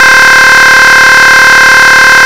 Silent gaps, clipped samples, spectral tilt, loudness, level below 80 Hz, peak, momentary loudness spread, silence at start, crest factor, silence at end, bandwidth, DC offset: none; 30%; 0 dB/octave; 0 LUFS; -34 dBFS; 0 dBFS; 0 LU; 0 s; 2 dB; 0 s; over 20 kHz; 5%